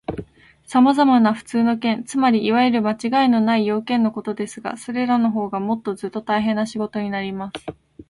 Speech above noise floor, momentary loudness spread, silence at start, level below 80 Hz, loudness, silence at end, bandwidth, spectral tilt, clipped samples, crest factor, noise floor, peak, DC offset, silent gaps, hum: 25 dB; 12 LU; 0.1 s; -56 dBFS; -20 LUFS; 0.05 s; 11.5 kHz; -6 dB/octave; under 0.1%; 16 dB; -44 dBFS; -4 dBFS; under 0.1%; none; none